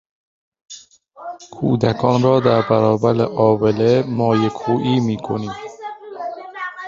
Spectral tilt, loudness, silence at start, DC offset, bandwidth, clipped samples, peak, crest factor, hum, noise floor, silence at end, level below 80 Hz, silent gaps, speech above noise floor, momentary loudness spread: -7.5 dB/octave; -17 LUFS; 0.7 s; under 0.1%; 7.6 kHz; under 0.1%; -2 dBFS; 16 dB; none; -42 dBFS; 0 s; -52 dBFS; none; 25 dB; 19 LU